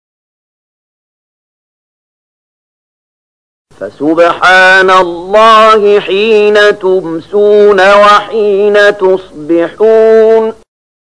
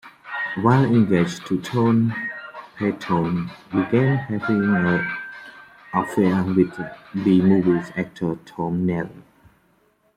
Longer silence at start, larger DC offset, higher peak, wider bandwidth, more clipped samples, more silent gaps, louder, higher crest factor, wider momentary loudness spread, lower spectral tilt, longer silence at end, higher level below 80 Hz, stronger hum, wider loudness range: first, 3.8 s vs 0.05 s; first, 0.9% vs under 0.1%; about the same, 0 dBFS vs -2 dBFS; about the same, 10.5 kHz vs 11 kHz; first, 0.4% vs under 0.1%; neither; first, -6 LUFS vs -21 LUFS; second, 8 dB vs 18 dB; second, 10 LU vs 13 LU; second, -4 dB/octave vs -8 dB/octave; second, 0.6 s vs 0.95 s; first, -48 dBFS vs -58 dBFS; neither; first, 5 LU vs 2 LU